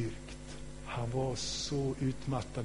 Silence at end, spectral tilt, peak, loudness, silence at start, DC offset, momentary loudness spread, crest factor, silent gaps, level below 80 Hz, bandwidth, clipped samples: 0 s; -5 dB/octave; -22 dBFS; -36 LUFS; 0 s; 0.3%; 13 LU; 14 dB; none; -50 dBFS; 10.5 kHz; under 0.1%